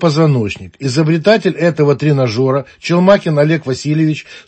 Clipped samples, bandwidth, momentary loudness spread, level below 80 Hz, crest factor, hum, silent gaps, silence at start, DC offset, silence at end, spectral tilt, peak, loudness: under 0.1%; 8.6 kHz; 7 LU; -50 dBFS; 12 dB; none; none; 0 s; under 0.1%; 0.05 s; -7 dB/octave; 0 dBFS; -13 LUFS